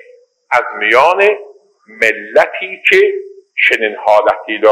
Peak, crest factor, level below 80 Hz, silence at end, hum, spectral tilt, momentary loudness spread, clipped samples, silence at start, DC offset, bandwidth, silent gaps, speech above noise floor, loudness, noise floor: 0 dBFS; 14 dB; -60 dBFS; 0 s; none; -3 dB/octave; 7 LU; 0.2%; 0.5 s; under 0.1%; 15.5 kHz; none; 33 dB; -12 LUFS; -45 dBFS